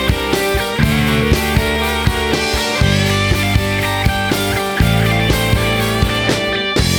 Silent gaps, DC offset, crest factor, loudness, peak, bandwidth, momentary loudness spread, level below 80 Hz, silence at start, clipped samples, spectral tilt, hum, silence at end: none; under 0.1%; 14 dB; -15 LUFS; -2 dBFS; over 20 kHz; 2 LU; -24 dBFS; 0 s; under 0.1%; -4.5 dB/octave; none; 0 s